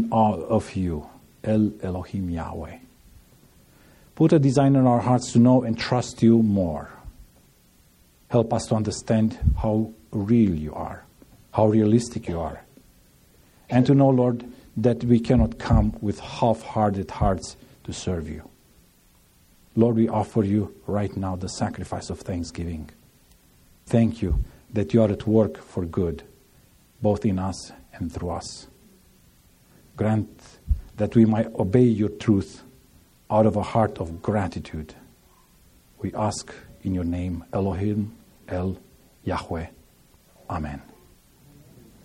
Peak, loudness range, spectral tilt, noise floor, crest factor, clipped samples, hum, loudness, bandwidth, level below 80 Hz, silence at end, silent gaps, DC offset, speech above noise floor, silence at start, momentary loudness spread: -4 dBFS; 9 LU; -7.5 dB/octave; -58 dBFS; 20 dB; under 0.1%; none; -24 LUFS; 11.5 kHz; -40 dBFS; 1.25 s; none; under 0.1%; 35 dB; 0 s; 16 LU